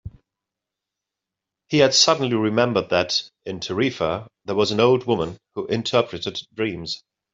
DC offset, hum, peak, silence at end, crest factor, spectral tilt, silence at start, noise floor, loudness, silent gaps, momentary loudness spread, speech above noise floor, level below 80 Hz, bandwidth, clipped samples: under 0.1%; none; -2 dBFS; 0.35 s; 20 dB; -4 dB/octave; 0.05 s; -86 dBFS; -21 LUFS; none; 14 LU; 64 dB; -56 dBFS; 7.8 kHz; under 0.1%